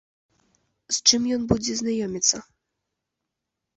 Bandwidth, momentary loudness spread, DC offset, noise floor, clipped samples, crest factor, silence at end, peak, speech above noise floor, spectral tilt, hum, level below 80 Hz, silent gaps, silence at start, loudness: 8.4 kHz; 9 LU; under 0.1%; -83 dBFS; under 0.1%; 24 dB; 1.35 s; -2 dBFS; 60 dB; -2.5 dB/octave; none; -52 dBFS; none; 0.9 s; -22 LUFS